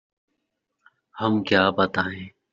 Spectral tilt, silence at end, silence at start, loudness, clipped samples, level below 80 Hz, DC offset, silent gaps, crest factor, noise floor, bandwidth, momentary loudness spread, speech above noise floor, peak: -3.5 dB/octave; 0.25 s; 1.15 s; -22 LUFS; under 0.1%; -64 dBFS; under 0.1%; none; 22 dB; -78 dBFS; 7.4 kHz; 10 LU; 56 dB; -4 dBFS